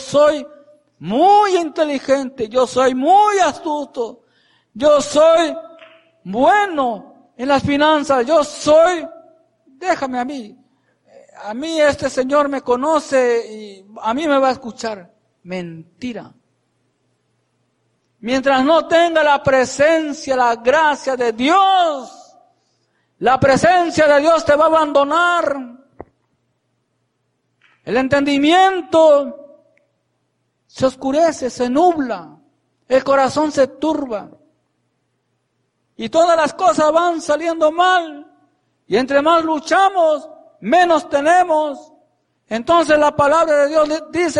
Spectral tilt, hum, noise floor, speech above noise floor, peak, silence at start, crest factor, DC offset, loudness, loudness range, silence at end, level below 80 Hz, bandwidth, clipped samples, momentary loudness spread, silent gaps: -4 dB/octave; none; -68 dBFS; 53 dB; -2 dBFS; 0 s; 14 dB; under 0.1%; -15 LUFS; 6 LU; 0 s; -52 dBFS; 11.5 kHz; under 0.1%; 15 LU; none